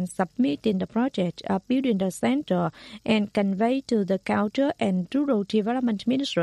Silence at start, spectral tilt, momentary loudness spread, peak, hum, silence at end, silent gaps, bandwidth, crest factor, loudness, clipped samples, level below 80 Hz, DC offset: 0 s; -6.5 dB/octave; 3 LU; -10 dBFS; none; 0 s; none; 12 kHz; 16 dB; -25 LUFS; under 0.1%; -62 dBFS; under 0.1%